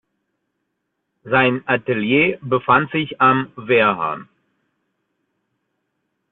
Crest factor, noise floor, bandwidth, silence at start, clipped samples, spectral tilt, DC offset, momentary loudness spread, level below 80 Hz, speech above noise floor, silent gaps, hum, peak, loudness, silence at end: 18 dB; -75 dBFS; 4.2 kHz; 1.25 s; under 0.1%; -9.5 dB/octave; under 0.1%; 7 LU; -58 dBFS; 57 dB; none; none; -2 dBFS; -17 LUFS; 2.1 s